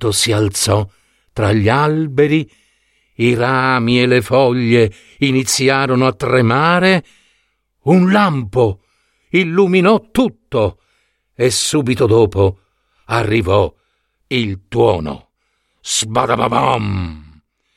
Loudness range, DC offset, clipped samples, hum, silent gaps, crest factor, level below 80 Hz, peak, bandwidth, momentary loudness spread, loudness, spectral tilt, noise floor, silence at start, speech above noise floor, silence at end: 4 LU; under 0.1%; under 0.1%; none; none; 14 dB; -44 dBFS; 0 dBFS; 16 kHz; 8 LU; -15 LUFS; -5 dB/octave; -66 dBFS; 0 s; 52 dB; 0.55 s